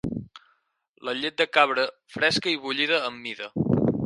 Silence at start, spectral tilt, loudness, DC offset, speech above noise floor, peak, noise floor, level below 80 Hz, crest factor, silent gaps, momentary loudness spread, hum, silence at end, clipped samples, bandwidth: 0.05 s; -5 dB/octave; -24 LUFS; under 0.1%; 44 dB; -2 dBFS; -69 dBFS; -54 dBFS; 24 dB; 0.89-0.94 s; 13 LU; none; 0 s; under 0.1%; 11.5 kHz